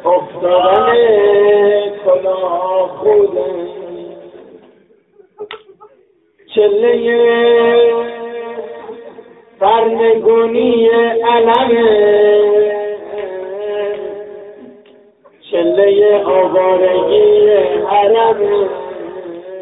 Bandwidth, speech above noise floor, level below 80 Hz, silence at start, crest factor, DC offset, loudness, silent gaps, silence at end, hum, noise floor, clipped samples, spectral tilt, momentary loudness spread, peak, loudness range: 4 kHz; 41 dB; -54 dBFS; 0 s; 12 dB; under 0.1%; -12 LUFS; none; 0 s; none; -51 dBFS; under 0.1%; -8 dB/octave; 19 LU; 0 dBFS; 8 LU